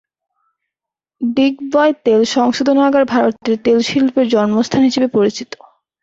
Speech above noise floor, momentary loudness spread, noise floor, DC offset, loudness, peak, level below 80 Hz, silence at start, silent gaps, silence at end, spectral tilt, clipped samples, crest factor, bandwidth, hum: 71 dB; 6 LU; -85 dBFS; under 0.1%; -14 LUFS; -2 dBFS; -56 dBFS; 1.2 s; none; 0.6 s; -5 dB/octave; under 0.1%; 14 dB; 7.8 kHz; none